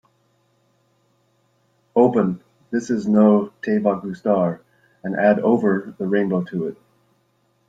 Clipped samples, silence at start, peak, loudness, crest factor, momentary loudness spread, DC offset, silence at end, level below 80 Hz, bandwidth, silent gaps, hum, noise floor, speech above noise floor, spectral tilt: under 0.1%; 1.95 s; -2 dBFS; -20 LUFS; 18 dB; 12 LU; under 0.1%; 0.95 s; -64 dBFS; 7.8 kHz; none; none; -65 dBFS; 46 dB; -8.5 dB/octave